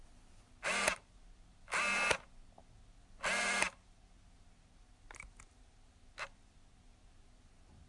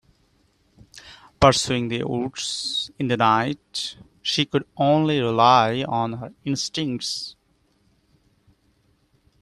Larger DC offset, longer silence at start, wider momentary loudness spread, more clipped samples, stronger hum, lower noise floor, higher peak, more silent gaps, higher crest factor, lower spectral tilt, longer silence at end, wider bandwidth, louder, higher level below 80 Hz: neither; second, 0 s vs 0.95 s; first, 21 LU vs 12 LU; neither; neither; about the same, -62 dBFS vs -65 dBFS; second, -14 dBFS vs 0 dBFS; neither; about the same, 28 dB vs 24 dB; second, -1 dB/octave vs -4.5 dB/octave; second, 0.1 s vs 2.1 s; second, 11.5 kHz vs 14 kHz; second, -36 LUFS vs -22 LUFS; second, -62 dBFS vs -52 dBFS